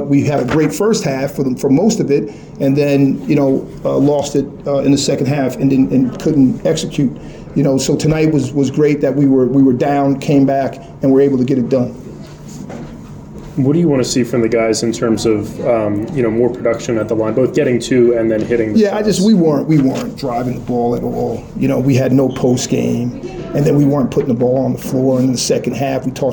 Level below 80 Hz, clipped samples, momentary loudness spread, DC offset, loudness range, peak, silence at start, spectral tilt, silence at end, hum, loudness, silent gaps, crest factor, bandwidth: -42 dBFS; under 0.1%; 8 LU; under 0.1%; 3 LU; -2 dBFS; 0 s; -6.5 dB/octave; 0 s; none; -14 LUFS; none; 12 dB; 19.5 kHz